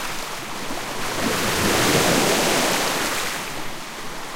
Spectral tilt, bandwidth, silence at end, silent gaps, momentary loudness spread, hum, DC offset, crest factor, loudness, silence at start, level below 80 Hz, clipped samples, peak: -2.5 dB/octave; 17 kHz; 0 s; none; 14 LU; none; under 0.1%; 18 dB; -21 LUFS; 0 s; -40 dBFS; under 0.1%; -6 dBFS